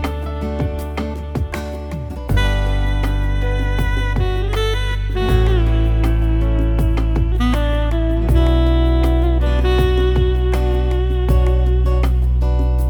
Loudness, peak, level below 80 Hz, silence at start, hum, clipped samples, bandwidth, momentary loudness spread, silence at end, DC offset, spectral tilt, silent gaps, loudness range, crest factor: -18 LUFS; -4 dBFS; -16 dBFS; 0 s; none; under 0.1%; 12 kHz; 8 LU; 0 s; under 0.1%; -7.5 dB/octave; none; 4 LU; 12 dB